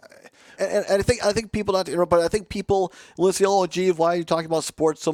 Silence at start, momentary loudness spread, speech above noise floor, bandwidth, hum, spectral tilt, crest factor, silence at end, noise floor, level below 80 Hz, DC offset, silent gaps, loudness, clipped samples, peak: 0.25 s; 5 LU; 28 dB; 15.5 kHz; none; -4.5 dB/octave; 16 dB; 0 s; -49 dBFS; -48 dBFS; under 0.1%; none; -22 LUFS; under 0.1%; -6 dBFS